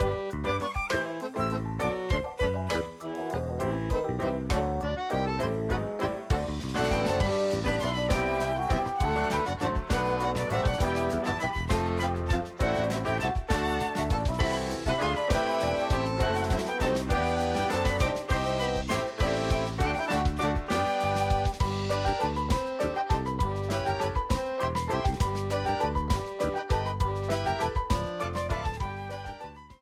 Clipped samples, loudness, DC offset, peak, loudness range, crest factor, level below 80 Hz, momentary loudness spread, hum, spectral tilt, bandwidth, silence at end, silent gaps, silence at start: under 0.1%; -29 LUFS; under 0.1%; -12 dBFS; 3 LU; 16 dB; -36 dBFS; 4 LU; none; -5.5 dB/octave; 16 kHz; 0.05 s; none; 0 s